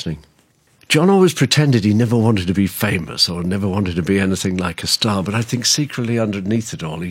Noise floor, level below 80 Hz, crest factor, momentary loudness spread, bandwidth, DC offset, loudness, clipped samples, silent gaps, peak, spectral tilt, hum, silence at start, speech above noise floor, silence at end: -57 dBFS; -46 dBFS; 16 dB; 8 LU; 16.5 kHz; under 0.1%; -17 LUFS; under 0.1%; none; -2 dBFS; -4.5 dB/octave; none; 0 s; 40 dB; 0 s